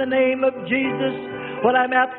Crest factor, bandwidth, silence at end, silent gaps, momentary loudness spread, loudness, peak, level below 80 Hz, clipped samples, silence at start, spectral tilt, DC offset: 16 dB; 4.1 kHz; 0 s; none; 9 LU; -21 LUFS; -4 dBFS; -62 dBFS; under 0.1%; 0 s; -10 dB/octave; under 0.1%